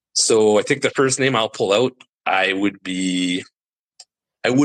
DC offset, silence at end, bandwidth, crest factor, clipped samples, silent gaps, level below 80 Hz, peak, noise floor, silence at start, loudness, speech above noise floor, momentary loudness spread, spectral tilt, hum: under 0.1%; 0 s; 12 kHz; 16 dB; under 0.1%; 2.09-2.18 s, 3.65-3.69 s, 3.79-3.88 s; -68 dBFS; -4 dBFS; -51 dBFS; 0.15 s; -19 LUFS; 33 dB; 9 LU; -3.5 dB/octave; none